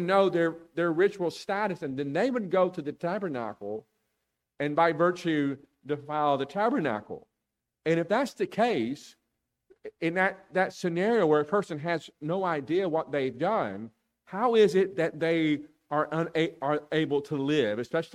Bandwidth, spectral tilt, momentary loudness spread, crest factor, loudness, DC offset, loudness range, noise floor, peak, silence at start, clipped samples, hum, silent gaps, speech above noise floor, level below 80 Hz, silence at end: 13 kHz; -6.5 dB/octave; 11 LU; 18 dB; -28 LUFS; under 0.1%; 3 LU; -85 dBFS; -10 dBFS; 0 s; under 0.1%; none; none; 57 dB; -72 dBFS; 0.1 s